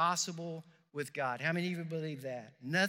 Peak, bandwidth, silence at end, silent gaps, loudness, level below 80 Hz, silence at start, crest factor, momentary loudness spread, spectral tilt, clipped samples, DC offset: -18 dBFS; 16.5 kHz; 0 s; none; -37 LUFS; under -90 dBFS; 0 s; 18 dB; 11 LU; -4 dB/octave; under 0.1%; under 0.1%